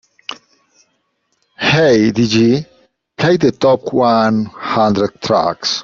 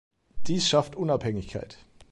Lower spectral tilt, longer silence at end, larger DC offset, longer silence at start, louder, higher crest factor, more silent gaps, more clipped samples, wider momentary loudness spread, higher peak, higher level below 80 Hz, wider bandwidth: about the same, -5.5 dB/octave vs -4.5 dB/octave; about the same, 0 s vs 0 s; neither; first, 0.3 s vs 0.1 s; first, -14 LUFS vs -27 LUFS; about the same, 14 dB vs 18 dB; neither; neither; second, 7 LU vs 17 LU; first, -2 dBFS vs -10 dBFS; about the same, -50 dBFS vs -50 dBFS; second, 7.4 kHz vs 11.5 kHz